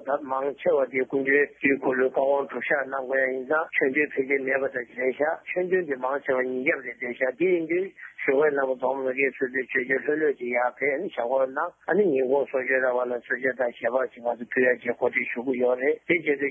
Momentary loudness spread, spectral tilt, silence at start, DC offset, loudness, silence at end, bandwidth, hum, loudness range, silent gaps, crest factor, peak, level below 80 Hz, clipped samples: 5 LU; -8 dB/octave; 0 s; under 0.1%; -25 LUFS; 0 s; 3.6 kHz; none; 2 LU; none; 16 dB; -10 dBFS; -72 dBFS; under 0.1%